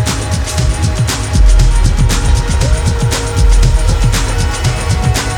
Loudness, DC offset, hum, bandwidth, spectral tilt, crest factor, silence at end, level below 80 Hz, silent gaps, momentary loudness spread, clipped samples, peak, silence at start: -13 LUFS; under 0.1%; none; 15.5 kHz; -4.5 dB/octave; 10 dB; 0 s; -12 dBFS; none; 4 LU; under 0.1%; 0 dBFS; 0 s